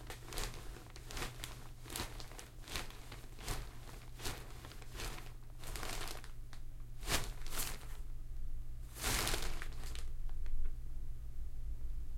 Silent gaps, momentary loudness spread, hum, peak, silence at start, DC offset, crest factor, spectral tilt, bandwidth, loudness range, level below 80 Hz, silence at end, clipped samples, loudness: none; 14 LU; none; -16 dBFS; 0 s; under 0.1%; 24 dB; -2.5 dB/octave; 16.5 kHz; 6 LU; -44 dBFS; 0 s; under 0.1%; -45 LUFS